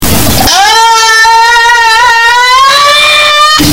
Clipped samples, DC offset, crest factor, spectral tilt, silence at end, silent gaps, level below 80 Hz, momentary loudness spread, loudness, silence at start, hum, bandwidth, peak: 7%; under 0.1%; 4 dB; -1.5 dB/octave; 0 s; none; -26 dBFS; 1 LU; -3 LUFS; 0 s; none; over 20 kHz; 0 dBFS